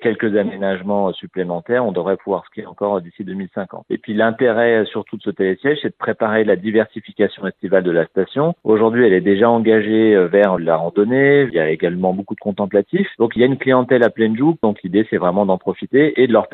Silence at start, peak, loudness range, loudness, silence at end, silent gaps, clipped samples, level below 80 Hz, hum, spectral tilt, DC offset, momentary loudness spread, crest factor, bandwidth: 0 s; 0 dBFS; 6 LU; -17 LUFS; 0.05 s; none; under 0.1%; -62 dBFS; none; -10 dB/octave; under 0.1%; 11 LU; 16 dB; 4.1 kHz